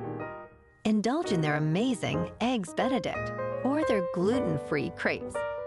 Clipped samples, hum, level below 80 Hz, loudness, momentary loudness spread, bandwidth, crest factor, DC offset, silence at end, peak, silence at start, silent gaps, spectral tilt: under 0.1%; none; -56 dBFS; -29 LUFS; 7 LU; 12 kHz; 14 dB; under 0.1%; 0 s; -14 dBFS; 0 s; none; -6 dB/octave